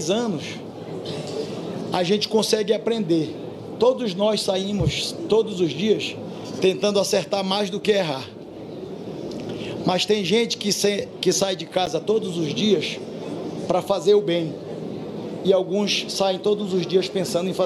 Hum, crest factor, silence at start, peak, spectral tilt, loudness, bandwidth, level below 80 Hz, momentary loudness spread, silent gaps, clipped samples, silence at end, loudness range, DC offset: none; 18 dB; 0 s; -4 dBFS; -4.5 dB/octave; -23 LUFS; 15 kHz; -54 dBFS; 12 LU; none; under 0.1%; 0 s; 2 LU; under 0.1%